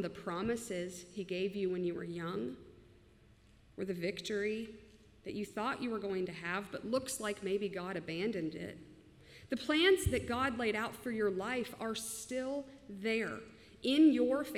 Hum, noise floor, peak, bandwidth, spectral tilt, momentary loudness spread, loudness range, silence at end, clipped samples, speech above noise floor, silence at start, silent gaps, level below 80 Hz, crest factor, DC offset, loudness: none; -63 dBFS; -16 dBFS; 16 kHz; -4.5 dB/octave; 15 LU; 7 LU; 0 s; under 0.1%; 27 dB; 0 s; none; -60 dBFS; 20 dB; under 0.1%; -36 LUFS